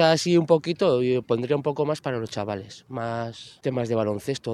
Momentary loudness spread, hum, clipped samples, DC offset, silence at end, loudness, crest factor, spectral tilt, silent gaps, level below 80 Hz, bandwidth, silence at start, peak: 12 LU; none; under 0.1%; under 0.1%; 0 s; -25 LUFS; 20 dB; -6 dB/octave; none; -64 dBFS; 13 kHz; 0 s; -4 dBFS